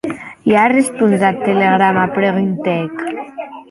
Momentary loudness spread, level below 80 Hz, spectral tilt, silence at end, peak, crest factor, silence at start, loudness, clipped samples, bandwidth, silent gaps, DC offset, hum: 13 LU; -56 dBFS; -6 dB/octave; 0.05 s; -2 dBFS; 14 dB; 0.05 s; -14 LUFS; under 0.1%; 12 kHz; none; under 0.1%; none